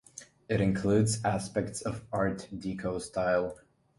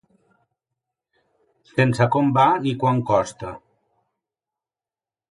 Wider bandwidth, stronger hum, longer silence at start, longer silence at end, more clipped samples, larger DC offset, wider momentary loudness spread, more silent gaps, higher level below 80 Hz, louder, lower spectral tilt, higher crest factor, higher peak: about the same, 11.5 kHz vs 11.5 kHz; neither; second, 0.15 s vs 1.75 s; second, 0.45 s vs 1.75 s; neither; neither; about the same, 11 LU vs 13 LU; neither; about the same, -54 dBFS vs -58 dBFS; second, -31 LUFS vs -20 LUFS; about the same, -6 dB/octave vs -7 dB/octave; about the same, 18 dB vs 20 dB; second, -14 dBFS vs -4 dBFS